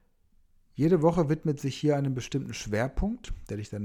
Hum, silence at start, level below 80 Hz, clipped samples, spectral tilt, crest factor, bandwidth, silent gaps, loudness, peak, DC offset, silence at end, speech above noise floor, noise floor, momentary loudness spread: none; 0.75 s; -44 dBFS; under 0.1%; -7 dB/octave; 18 dB; 14 kHz; none; -28 LUFS; -12 dBFS; under 0.1%; 0 s; 36 dB; -63 dBFS; 14 LU